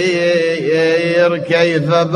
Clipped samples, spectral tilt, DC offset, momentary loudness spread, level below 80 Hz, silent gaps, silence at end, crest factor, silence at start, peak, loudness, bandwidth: under 0.1%; -5.5 dB/octave; under 0.1%; 2 LU; -58 dBFS; none; 0 s; 12 dB; 0 s; 0 dBFS; -14 LUFS; 10.5 kHz